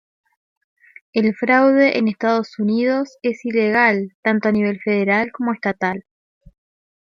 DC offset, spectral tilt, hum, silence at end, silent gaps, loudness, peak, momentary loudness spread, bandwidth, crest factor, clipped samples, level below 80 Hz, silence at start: under 0.1%; -7 dB/octave; none; 1.1 s; 4.15-4.23 s; -18 LUFS; -4 dBFS; 9 LU; 7.2 kHz; 16 dB; under 0.1%; -62 dBFS; 1.15 s